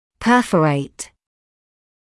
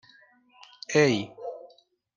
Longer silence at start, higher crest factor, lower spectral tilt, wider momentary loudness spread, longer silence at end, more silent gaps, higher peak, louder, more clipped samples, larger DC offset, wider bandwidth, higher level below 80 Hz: second, 0.2 s vs 0.9 s; about the same, 18 dB vs 22 dB; about the same, -5.5 dB/octave vs -5 dB/octave; second, 19 LU vs 22 LU; first, 1.05 s vs 0.5 s; neither; first, -4 dBFS vs -8 dBFS; first, -17 LUFS vs -25 LUFS; neither; neither; first, 12 kHz vs 9.8 kHz; first, -52 dBFS vs -72 dBFS